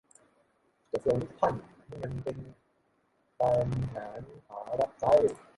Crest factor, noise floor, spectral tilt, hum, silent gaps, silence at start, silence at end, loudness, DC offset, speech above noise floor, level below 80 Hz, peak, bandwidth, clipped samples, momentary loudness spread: 20 dB; -72 dBFS; -7.5 dB/octave; none; none; 0.95 s; 0.2 s; -30 LUFS; under 0.1%; 42 dB; -56 dBFS; -10 dBFS; 11.5 kHz; under 0.1%; 20 LU